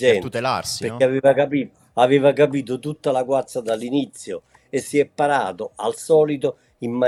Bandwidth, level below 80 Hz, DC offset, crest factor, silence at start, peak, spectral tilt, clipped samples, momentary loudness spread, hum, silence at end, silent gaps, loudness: 13.5 kHz; -64 dBFS; under 0.1%; 18 dB; 0 s; -2 dBFS; -5 dB/octave; under 0.1%; 12 LU; none; 0 s; none; -20 LUFS